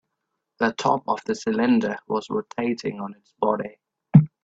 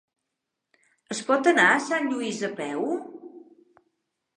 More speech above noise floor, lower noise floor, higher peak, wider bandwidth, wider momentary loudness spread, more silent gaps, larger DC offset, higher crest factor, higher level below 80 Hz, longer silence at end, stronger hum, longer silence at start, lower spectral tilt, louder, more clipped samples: second, 55 dB vs 59 dB; about the same, -80 dBFS vs -83 dBFS; first, -2 dBFS vs -6 dBFS; second, 7.8 kHz vs 10.5 kHz; second, 12 LU vs 16 LU; neither; neither; about the same, 22 dB vs 22 dB; first, -58 dBFS vs -84 dBFS; second, 0.15 s vs 1 s; neither; second, 0.6 s vs 1.1 s; first, -7.5 dB/octave vs -3.5 dB/octave; about the same, -23 LUFS vs -24 LUFS; neither